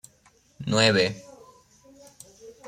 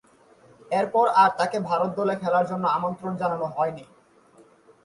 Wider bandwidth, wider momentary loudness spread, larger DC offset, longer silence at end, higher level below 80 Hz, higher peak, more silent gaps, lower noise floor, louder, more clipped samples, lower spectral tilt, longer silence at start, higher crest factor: first, 16 kHz vs 11.5 kHz; first, 27 LU vs 9 LU; neither; second, 0 s vs 1 s; first, -62 dBFS vs -68 dBFS; about the same, -8 dBFS vs -6 dBFS; neither; first, -61 dBFS vs -55 dBFS; about the same, -22 LUFS vs -24 LUFS; neither; second, -4 dB/octave vs -6 dB/octave; about the same, 0.6 s vs 0.7 s; about the same, 20 dB vs 18 dB